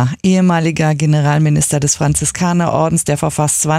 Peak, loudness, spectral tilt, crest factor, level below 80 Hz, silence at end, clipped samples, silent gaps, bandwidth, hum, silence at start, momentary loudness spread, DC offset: 0 dBFS; -14 LUFS; -5 dB/octave; 12 dB; -40 dBFS; 0 s; under 0.1%; none; 15 kHz; none; 0 s; 2 LU; under 0.1%